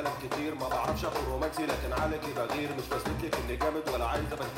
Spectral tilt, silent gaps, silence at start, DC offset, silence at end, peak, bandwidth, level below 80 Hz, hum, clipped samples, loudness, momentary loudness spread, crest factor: -5 dB/octave; none; 0 s; under 0.1%; 0 s; -16 dBFS; 16 kHz; -42 dBFS; none; under 0.1%; -32 LUFS; 3 LU; 16 dB